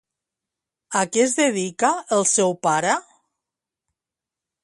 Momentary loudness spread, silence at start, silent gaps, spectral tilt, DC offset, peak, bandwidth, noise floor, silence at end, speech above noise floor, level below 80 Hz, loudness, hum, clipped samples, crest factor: 6 LU; 0.9 s; none; -3 dB/octave; under 0.1%; -6 dBFS; 11.5 kHz; -88 dBFS; 1.6 s; 68 dB; -72 dBFS; -20 LUFS; none; under 0.1%; 18 dB